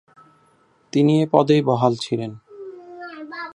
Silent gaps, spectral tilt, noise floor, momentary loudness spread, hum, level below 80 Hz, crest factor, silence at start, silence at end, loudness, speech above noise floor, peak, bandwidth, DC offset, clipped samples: none; -7 dB/octave; -59 dBFS; 22 LU; none; -66 dBFS; 20 dB; 0.95 s; 0.05 s; -19 LUFS; 41 dB; -2 dBFS; 10.5 kHz; under 0.1%; under 0.1%